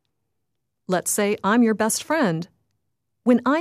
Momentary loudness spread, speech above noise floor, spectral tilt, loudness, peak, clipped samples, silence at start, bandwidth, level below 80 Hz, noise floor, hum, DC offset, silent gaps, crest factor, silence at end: 8 LU; 60 dB; -4.5 dB/octave; -21 LUFS; -6 dBFS; under 0.1%; 0.9 s; 15.5 kHz; -68 dBFS; -80 dBFS; none; under 0.1%; none; 16 dB; 0 s